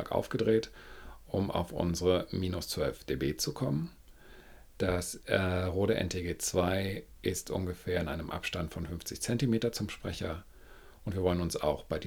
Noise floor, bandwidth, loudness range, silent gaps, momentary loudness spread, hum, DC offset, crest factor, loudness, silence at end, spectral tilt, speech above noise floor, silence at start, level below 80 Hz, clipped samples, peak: -54 dBFS; over 20 kHz; 2 LU; none; 9 LU; none; under 0.1%; 22 dB; -33 LUFS; 0 s; -5 dB/octave; 21 dB; 0 s; -52 dBFS; under 0.1%; -12 dBFS